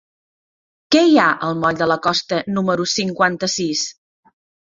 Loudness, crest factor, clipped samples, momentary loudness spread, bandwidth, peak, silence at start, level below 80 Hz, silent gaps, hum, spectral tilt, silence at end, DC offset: -17 LUFS; 18 dB; under 0.1%; 8 LU; 7.6 kHz; -2 dBFS; 0.9 s; -58 dBFS; none; none; -4 dB/octave; 0.85 s; under 0.1%